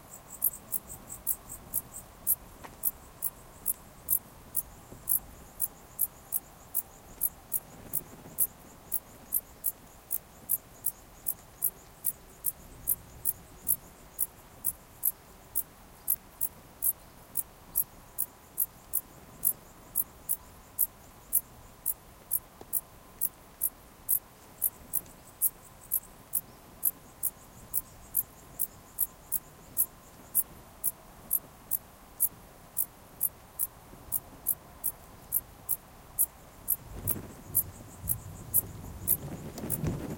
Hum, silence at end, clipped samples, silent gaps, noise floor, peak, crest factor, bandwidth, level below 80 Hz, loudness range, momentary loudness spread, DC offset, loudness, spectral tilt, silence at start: none; 0 s; under 0.1%; none; -52 dBFS; -8 dBFS; 28 dB; 17.5 kHz; -56 dBFS; 2 LU; 8 LU; under 0.1%; -32 LUFS; -3 dB/octave; 0.05 s